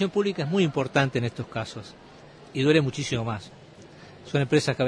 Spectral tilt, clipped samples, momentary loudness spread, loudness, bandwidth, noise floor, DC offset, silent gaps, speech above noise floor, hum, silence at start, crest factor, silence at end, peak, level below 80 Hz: -6 dB/octave; under 0.1%; 16 LU; -26 LUFS; 10.5 kHz; -48 dBFS; under 0.1%; none; 23 dB; none; 0 s; 20 dB; 0 s; -8 dBFS; -58 dBFS